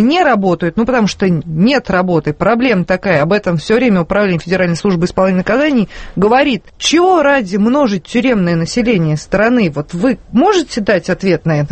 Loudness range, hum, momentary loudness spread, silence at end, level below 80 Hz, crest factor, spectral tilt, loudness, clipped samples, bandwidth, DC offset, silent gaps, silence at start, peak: 1 LU; none; 4 LU; 0 s; -38 dBFS; 12 dB; -6 dB/octave; -13 LUFS; under 0.1%; 8.8 kHz; under 0.1%; none; 0 s; 0 dBFS